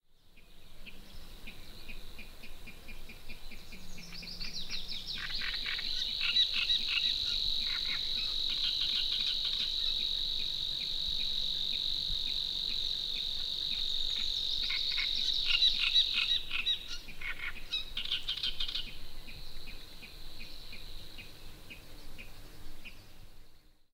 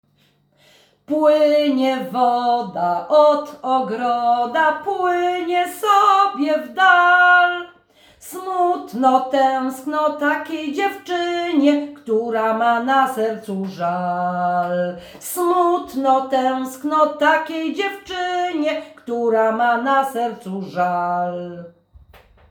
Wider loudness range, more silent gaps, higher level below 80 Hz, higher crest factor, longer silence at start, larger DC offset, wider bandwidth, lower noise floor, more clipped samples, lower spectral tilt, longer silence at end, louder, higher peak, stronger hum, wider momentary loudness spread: first, 20 LU vs 5 LU; neither; first, -46 dBFS vs -64 dBFS; about the same, 20 dB vs 16 dB; second, 0.25 s vs 1.1 s; neither; second, 16 kHz vs over 20 kHz; second, -56 dBFS vs -60 dBFS; neither; second, -0.5 dB/octave vs -4.5 dB/octave; second, 0.35 s vs 0.8 s; second, -31 LUFS vs -18 LUFS; second, -14 dBFS vs -2 dBFS; neither; first, 22 LU vs 11 LU